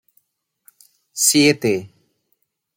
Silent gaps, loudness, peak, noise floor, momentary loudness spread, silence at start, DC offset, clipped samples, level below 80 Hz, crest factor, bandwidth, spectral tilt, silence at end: none; -16 LUFS; -2 dBFS; -71 dBFS; 13 LU; 1.15 s; under 0.1%; under 0.1%; -66 dBFS; 20 dB; 17 kHz; -3 dB/octave; 0.9 s